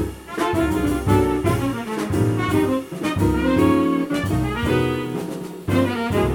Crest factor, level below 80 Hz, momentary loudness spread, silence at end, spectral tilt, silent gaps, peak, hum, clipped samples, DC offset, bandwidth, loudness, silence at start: 16 dB; -36 dBFS; 8 LU; 0 s; -6.5 dB/octave; none; -4 dBFS; none; under 0.1%; under 0.1%; 19 kHz; -21 LUFS; 0 s